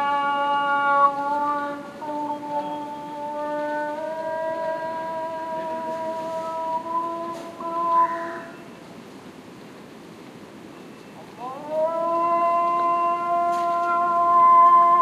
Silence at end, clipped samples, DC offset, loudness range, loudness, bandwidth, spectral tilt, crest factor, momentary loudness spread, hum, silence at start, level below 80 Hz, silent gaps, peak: 0 s; under 0.1%; under 0.1%; 9 LU; -23 LUFS; 13 kHz; -5 dB/octave; 16 dB; 23 LU; none; 0 s; -70 dBFS; none; -8 dBFS